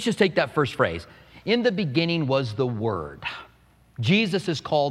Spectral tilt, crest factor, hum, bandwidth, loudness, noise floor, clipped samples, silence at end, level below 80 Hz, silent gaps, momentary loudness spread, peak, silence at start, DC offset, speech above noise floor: -6 dB/octave; 20 dB; none; 13 kHz; -24 LUFS; -57 dBFS; under 0.1%; 0 s; -56 dBFS; none; 12 LU; -4 dBFS; 0 s; under 0.1%; 33 dB